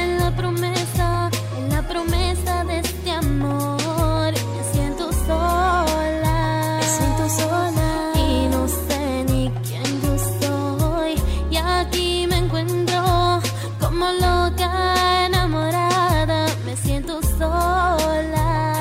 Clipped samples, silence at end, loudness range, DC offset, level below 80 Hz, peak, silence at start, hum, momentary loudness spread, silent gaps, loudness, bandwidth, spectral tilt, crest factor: under 0.1%; 0 s; 3 LU; under 0.1%; -28 dBFS; -6 dBFS; 0 s; none; 5 LU; none; -20 LUFS; 16.5 kHz; -5 dB/octave; 14 dB